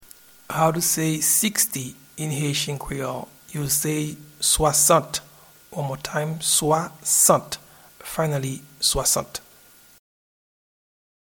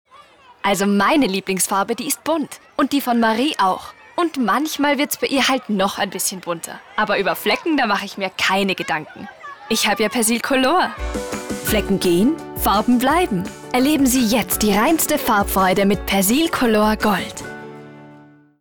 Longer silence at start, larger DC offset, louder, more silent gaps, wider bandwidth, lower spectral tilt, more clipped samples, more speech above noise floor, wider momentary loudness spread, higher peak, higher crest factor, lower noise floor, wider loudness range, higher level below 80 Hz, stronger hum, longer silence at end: first, 0.5 s vs 0.15 s; neither; second, -21 LUFS vs -18 LUFS; neither; about the same, 19 kHz vs over 20 kHz; about the same, -3 dB/octave vs -3.5 dB/octave; neither; about the same, 29 dB vs 29 dB; first, 16 LU vs 11 LU; first, -4 dBFS vs -8 dBFS; first, 22 dB vs 12 dB; first, -52 dBFS vs -47 dBFS; first, 6 LU vs 3 LU; second, -46 dBFS vs -40 dBFS; neither; first, 1.9 s vs 0.4 s